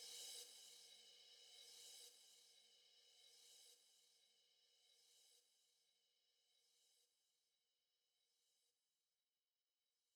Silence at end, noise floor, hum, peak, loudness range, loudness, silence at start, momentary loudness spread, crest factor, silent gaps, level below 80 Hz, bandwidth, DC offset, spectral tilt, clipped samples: 1.45 s; under -90 dBFS; none; -44 dBFS; 7 LU; -61 LUFS; 0 s; 14 LU; 24 dB; none; under -90 dBFS; over 20 kHz; under 0.1%; 3 dB/octave; under 0.1%